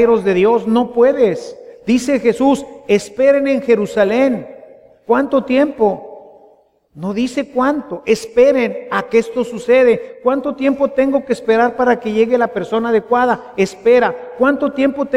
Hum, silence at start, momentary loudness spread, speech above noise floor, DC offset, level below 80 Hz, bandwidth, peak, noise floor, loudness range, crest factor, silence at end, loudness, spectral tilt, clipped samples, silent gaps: none; 0 s; 7 LU; 36 dB; under 0.1%; -52 dBFS; 12 kHz; -2 dBFS; -51 dBFS; 3 LU; 14 dB; 0 s; -15 LUFS; -5.5 dB/octave; under 0.1%; none